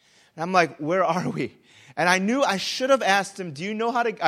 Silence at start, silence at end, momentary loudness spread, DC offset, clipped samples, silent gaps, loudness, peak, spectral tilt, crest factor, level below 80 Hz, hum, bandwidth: 0.35 s; 0 s; 12 LU; under 0.1%; under 0.1%; none; -23 LUFS; -4 dBFS; -4 dB/octave; 20 dB; -72 dBFS; none; 15 kHz